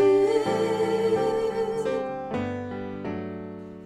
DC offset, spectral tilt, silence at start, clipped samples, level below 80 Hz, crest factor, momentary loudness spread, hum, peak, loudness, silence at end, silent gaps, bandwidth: under 0.1%; -6.5 dB/octave; 0 s; under 0.1%; -58 dBFS; 14 dB; 12 LU; none; -12 dBFS; -26 LUFS; 0 s; none; 13.5 kHz